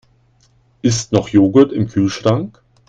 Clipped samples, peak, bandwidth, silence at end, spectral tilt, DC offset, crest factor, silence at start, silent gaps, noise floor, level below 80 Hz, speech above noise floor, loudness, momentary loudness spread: under 0.1%; 0 dBFS; 9.2 kHz; 0.4 s; -6 dB/octave; under 0.1%; 16 dB; 0.85 s; none; -55 dBFS; -48 dBFS; 41 dB; -15 LUFS; 9 LU